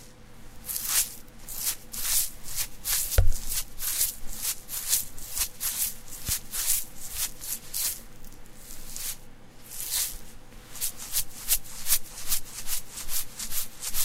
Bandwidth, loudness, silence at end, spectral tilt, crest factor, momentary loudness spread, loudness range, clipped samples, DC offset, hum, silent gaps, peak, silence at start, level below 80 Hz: 16 kHz; -29 LUFS; 0 s; -0.5 dB/octave; 26 dB; 14 LU; 5 LU; under 0.1%; under 0.1%; none; none; -2 dBFS; 0 s; -36 dBFS